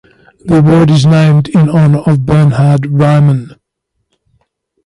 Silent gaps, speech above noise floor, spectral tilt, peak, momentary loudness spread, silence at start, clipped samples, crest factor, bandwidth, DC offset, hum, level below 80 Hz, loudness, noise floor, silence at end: none; 61 dB; -8 dB/octave; 0 dBFS; 5 LU; 0.45 s; under 0.1%; 10 dB; 11.5 kHz; under 0.1%; none; -38 dBFS; -8 LUFS; -68 dBFS; 1.4 s